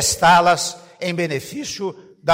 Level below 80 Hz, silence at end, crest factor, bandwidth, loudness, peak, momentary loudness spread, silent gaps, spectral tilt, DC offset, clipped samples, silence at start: -48 dBFS; 0 s; 14 dB; 16 kHz; -19 LUFS; -6 dBFS; 15 LU; none; -3 dB/octave; under 0.1%; under 0.1%; 0 s